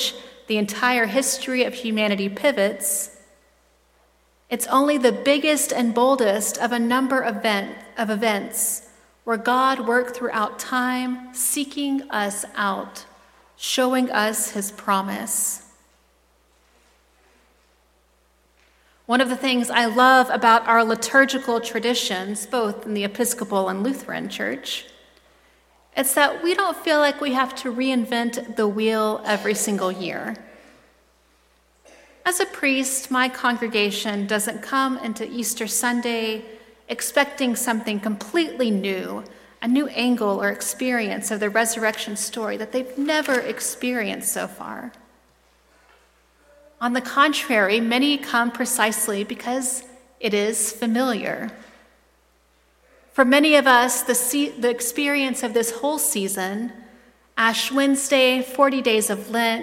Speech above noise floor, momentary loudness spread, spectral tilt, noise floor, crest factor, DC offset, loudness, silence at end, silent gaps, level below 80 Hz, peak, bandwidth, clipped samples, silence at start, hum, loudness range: 39 dB; 10 LU; -2.5 dB/octave; -61 dBFS; 20 dB; under 0.1%; -21 LUFS; 0 s; none; -64 dBFS; -2 dBFS; 16.5 kHz; under 0.1%; 0 s; none; 7 LU